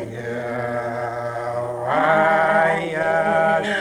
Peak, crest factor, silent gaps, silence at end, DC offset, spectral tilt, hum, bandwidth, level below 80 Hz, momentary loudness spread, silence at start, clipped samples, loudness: -6 dBFS; 14 dB; none; 0 s; under 0.1%; -5.5 dB/octave; none; 12 kHz; -56 dBFS; 10 LU; 0 s; under 0.1%; -20 LUFS